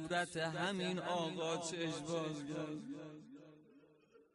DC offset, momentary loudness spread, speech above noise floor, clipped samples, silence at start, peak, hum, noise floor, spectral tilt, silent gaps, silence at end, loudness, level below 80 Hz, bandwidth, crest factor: under 0.1%; 17 LU; 27 dB; under 0.1%; 0 s; -26 dBFS; none; -67 dBFS; -4.5 dB/octave; none; 0.1 s; -41 LUFS; -78 dBFS; 11.5 kHz; 16 dB